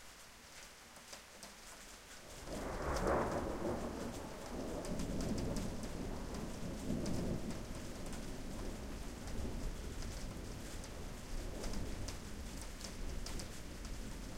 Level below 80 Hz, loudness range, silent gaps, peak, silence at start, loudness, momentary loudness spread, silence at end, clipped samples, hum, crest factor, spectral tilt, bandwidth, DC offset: -48 dBFS; 6 LU; none; -22 dBFS; 0 s; -45 LUFS; 12 LU; 0 s; under 0.1%; none; 20 dB; -5 dB/octave; 16.5 kHz; under 0.1%